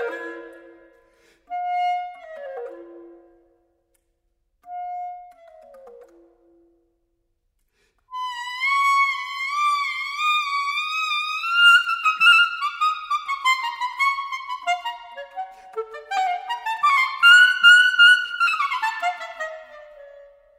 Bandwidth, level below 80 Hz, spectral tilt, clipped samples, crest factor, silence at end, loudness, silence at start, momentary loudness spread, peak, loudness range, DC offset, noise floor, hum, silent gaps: 16 kHz; -70 dBFS; 2.5 dB/octave; under 0.1%; 20 dB; 0.4 s; -18 LUFS; 0 s; 23 LU; -2 dBFS; 24 LU; under 0.1%; -71 dBFS; none; none